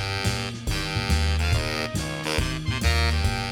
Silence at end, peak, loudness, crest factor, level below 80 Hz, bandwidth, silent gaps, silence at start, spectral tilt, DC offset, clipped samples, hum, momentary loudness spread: 0 s; -8 dBFS; -25 LUFS; 16 dB; -28 dBFS; 16.5 kHz; none; 0 s; -4.5 dB/octave; under 0.1%; under 0.1%; none; 6 LU